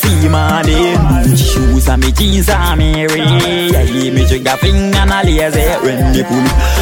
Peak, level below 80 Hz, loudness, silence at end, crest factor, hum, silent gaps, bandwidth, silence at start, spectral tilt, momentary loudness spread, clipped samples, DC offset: 0 dBFS; -14 dBFS; -11 LUFS; 0 s; 10 dB; none; none; 17 kHz; 0 s; -5 dB/octave; 2 LU; under 0.1%; under 0.1%